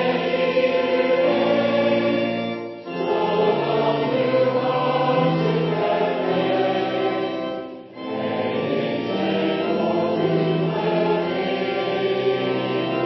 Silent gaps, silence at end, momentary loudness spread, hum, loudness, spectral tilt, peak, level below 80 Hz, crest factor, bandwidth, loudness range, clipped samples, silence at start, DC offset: none; 0 s; 7 LU; none; -21 LUFS; -8 dB/octave; -6 dBFS; -62 dBFS; 14 dB; 6 kHz; 3 LU; under 0.1%; 0 s; under 0.1%